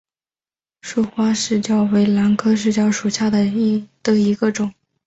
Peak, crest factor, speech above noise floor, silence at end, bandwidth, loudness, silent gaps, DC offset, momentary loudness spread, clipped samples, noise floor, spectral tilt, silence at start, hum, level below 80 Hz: -4 dBFS; 14 dB; over 73 dB; 0.35 s; 8 kHz; -18 LUFS; none; under 0.1%; 7 LU; under 0.1%; under -90 dBFS; -5.5 dB/octave; 0.85 s; none; -56 dBFS